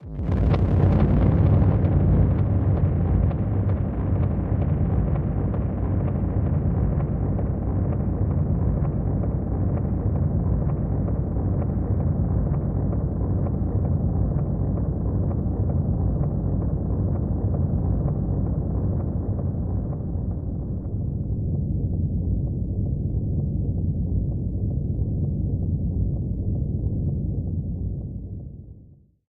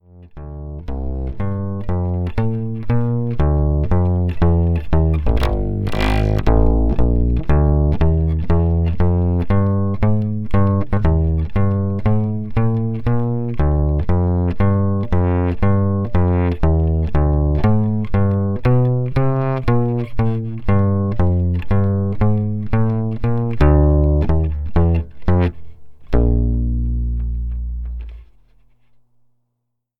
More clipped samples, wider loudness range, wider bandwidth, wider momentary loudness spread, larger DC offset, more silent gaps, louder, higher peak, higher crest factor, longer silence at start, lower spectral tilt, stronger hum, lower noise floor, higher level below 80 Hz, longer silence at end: neither; about the same, 6 LU vs 4 LU; second, 3.6 kHz vs 5.8 kHz; about the same, 7 LU vs 7 LU; neither; neither; second, -24 LUFS vs -18 LUFS; second, -8 dBFS vs 0 dBFS; about the same, 16 dB vs 16 dB; second, 0 s vs 0.15 s; first, -12.5 dB/octave vs -10 dB/octave; neither; second, -50 dBFS vs -74 dBFS; second, -28 dBFS vs -22 dBFS; second, 0.35 s vs 1.75 s